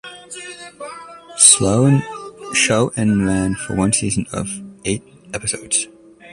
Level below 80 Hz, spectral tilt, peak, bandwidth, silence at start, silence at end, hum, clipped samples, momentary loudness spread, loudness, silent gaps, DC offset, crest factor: -44 dBFS; -3.5 dB/octave; 0 dBFS; 15 kHz; 0.05 s; 0 s; none; under 0.1%; 22 LU; -16 LUFS; none; under 0.1%; 18 dB